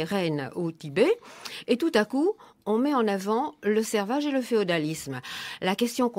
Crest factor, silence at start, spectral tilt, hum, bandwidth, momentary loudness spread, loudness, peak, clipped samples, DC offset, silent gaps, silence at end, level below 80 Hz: 18 dB; 0 s; -5 dB/octave; none; 16 kHz; 10 LU; -27 LUFS; -8 dBFS; under 0.1%; under 0.1%; none; 0 s; -70 dBFS